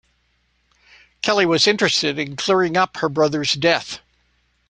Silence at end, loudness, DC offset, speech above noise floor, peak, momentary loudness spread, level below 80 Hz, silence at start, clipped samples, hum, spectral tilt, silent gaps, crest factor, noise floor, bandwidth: 0.7 s; -18 LUFS; under 0.1%; 46 dB; 0 dBFS; 8 LU; -58 dBFS; 1.25 s; under 0.1%; 60 Hz at -55 dBFS; -3.5 dB/octave; none; 20 dB; -65 dBFS; 10.5 kHz